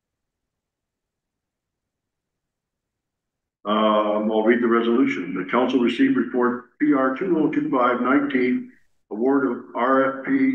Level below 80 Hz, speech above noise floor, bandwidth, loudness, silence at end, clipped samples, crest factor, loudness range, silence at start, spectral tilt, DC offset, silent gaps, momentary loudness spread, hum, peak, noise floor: -74 dBFS; 63 dB; 6.8 kHz; -21 LUFS; 0 s; under 0.1%; 16 dB; 5 LU; 3.65 s; -7 dB/octave; under 0.1%; none; 6 LU; none; -6 dBFS; -83 dBFS